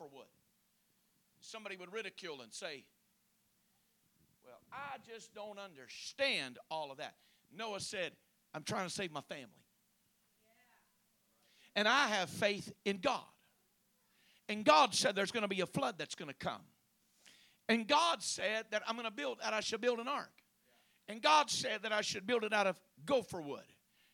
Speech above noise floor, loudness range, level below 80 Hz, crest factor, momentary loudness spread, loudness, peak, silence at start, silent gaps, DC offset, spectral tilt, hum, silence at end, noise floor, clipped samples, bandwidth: 40 dB; 14 LU; -80 dBFS; 26 dB; 19 LU; -36 LUFS; -12 dBFS; 0 s; none; under 0.1%; -2.5 dB/octave; none; 0.5 s; -77 dBFS; under 0.1%; 19 kHz